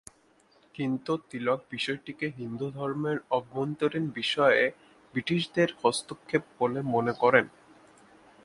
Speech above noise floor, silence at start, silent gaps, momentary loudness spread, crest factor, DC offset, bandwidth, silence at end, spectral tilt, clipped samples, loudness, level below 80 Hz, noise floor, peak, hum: 35 dB; 0.8 s; none; 12 LU; 24 dB; under 0.1%; 11.5 kHz; 0.95 s; -5 dB/octave; under 0.1%; -29 LUFS; -68 dBFS; -63 dBFS; -4 dBFS; none